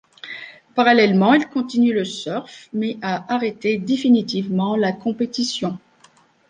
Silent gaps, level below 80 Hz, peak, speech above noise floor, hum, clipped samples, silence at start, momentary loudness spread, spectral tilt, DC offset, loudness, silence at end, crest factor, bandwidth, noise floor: none; -66 dBFS; -2 dBFS; 35 dB; none; under 0.1%; 0.25 s; 15 LU; -5.5 dB/octave; under 0.1%; -20 LUFS; 0.75 s; 18 dB; 9.4 kHz; -54 dBFS